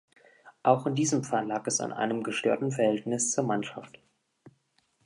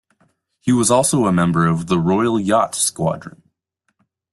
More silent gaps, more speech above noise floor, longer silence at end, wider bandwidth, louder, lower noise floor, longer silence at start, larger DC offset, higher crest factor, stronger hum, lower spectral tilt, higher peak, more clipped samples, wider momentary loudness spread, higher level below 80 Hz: neither; second, 43 dB vs 54 dB; second, 0.55 s vs 1 s; about the same, 11.5 kHz vs 12.5 kHz; second, -28 LUFS vs -17 LUFS; about the same, -71 dBFS vs -71 dBFS; second, 0.45 s vs 0.65 s; neither; first, 22 dB vs 16 dB; neither; about the same, -4.5 dB/octave vs -5 dB/octave; second, -8 dBFS vs -2 dBFS; neither; second, 5 LU vs 8 LU; second, -76 dBFS vs -52 dBFS